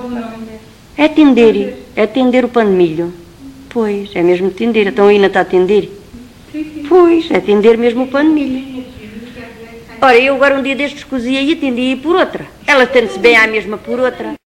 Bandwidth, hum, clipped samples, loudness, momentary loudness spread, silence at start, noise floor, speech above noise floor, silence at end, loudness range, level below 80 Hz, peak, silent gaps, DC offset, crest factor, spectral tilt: 15 kHz; none; 0.2%; -11 LUFS; 20 LU; 0 s; -35 dBFS; 24 dB; 0.15 s; 2 LU; -44 dBFS; 0 dBFS; none; under 0.1%; 12 dB; -5.5 dB/octave